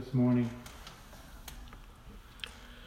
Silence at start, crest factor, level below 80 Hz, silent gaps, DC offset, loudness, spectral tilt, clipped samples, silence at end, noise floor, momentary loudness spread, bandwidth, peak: 0 s; 16 dB; -52 dBFS; none; under 0.1%; -33 LUFS; -7 dB/octave; under 0.1%; 0 s; -51 dBFS; 24 LU; 16 kHz; -20 dBFS